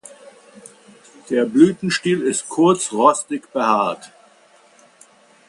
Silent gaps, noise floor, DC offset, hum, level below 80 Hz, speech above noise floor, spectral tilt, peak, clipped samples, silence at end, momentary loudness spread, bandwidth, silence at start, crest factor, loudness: none; -52 dBFS; under 0.1%; none; -66 dBFS; 35 dB; -4.5 dB/octave; 0 dBFS; under 0.1%; 1.45 s; 9 LU; 11.5 kHz; 1.3 s; 20 dB; -18 LUFS